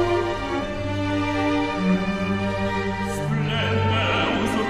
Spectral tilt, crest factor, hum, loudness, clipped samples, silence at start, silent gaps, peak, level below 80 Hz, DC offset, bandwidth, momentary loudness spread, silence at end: -6 dB/octave; 14 dB; none; -23 LUFS; under 0.1%; 0 s; none; -10 dBFS; -40 dBFS; under 0.1%; 13.5 kHz; 5 LU; 0 s